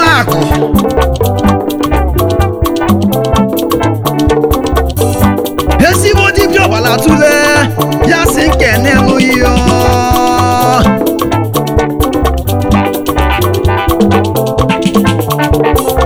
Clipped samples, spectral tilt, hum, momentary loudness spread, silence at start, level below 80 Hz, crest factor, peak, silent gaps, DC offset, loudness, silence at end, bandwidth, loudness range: 1%; -5.5 dB/octave; none; 5 LU; 0 s; -20 dBFS; 8 dB; 0 dBFS; none; under 0.1%; -10 LUFS; 0 s; over 20 kHz; 3 LU